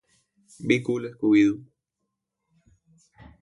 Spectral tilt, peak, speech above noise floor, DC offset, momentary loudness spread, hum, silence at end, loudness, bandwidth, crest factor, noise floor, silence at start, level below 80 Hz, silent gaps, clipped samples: -6.5 dB/octave; -6 dBFS; 59 dB; under 0.1%; 15 LU; none; 1.8 s; -23 LUFS; 11 kHz; 22 dB; -82 dBFS; 0.6 s; -64 dBFS; none; under 0.1%